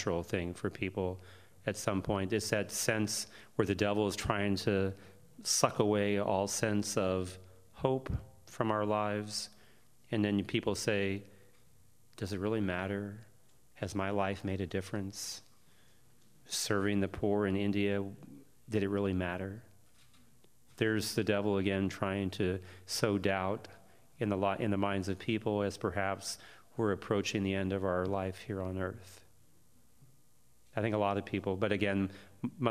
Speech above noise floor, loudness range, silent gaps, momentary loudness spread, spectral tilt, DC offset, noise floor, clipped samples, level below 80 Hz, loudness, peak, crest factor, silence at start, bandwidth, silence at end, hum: 36 dB; 5 LU; none; 10 LU; -5 dB/octave; under 0.1%; -69 dBFS; under 0.1%; -62 dBFS; -34 LUFS; -10 dBFS; 24 dB; 0 s; 15.5 kHz; 0 s; none